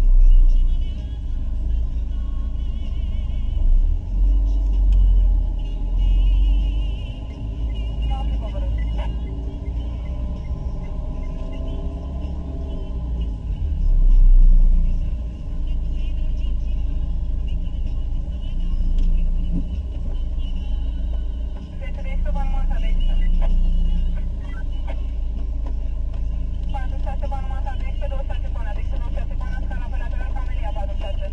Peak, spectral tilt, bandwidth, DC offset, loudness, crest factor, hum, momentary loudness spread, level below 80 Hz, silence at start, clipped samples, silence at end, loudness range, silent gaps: -6 dBFS; -8 dB/octave; 3.5 kHz; under 0.1%; -26 LUFS; 14 dB; none; 9 LU; -20 dBFS; 0 s; under 0.1%; 0 s; 6 LU; none